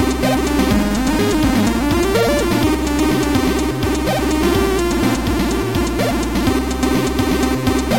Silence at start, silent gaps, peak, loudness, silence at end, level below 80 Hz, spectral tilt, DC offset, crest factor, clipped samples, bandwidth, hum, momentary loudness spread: 0 s; none; -4 dBFS; -17 LUFS; 0 s; -26 dBFS; -5 dB/octave; 0.8%; 12 dB; under 0.1%; 17 kHz; none; 3 LU